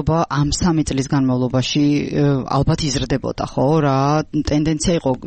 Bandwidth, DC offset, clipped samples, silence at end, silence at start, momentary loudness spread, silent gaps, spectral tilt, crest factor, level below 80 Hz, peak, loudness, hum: 8.8 kHz; under 0.1%; under 0.1%; 0 s; 0 s; 3 LU; none; -6 dB/octave; 10 dB; -34 dBFS; -8 dBFS; -18 LUFS; none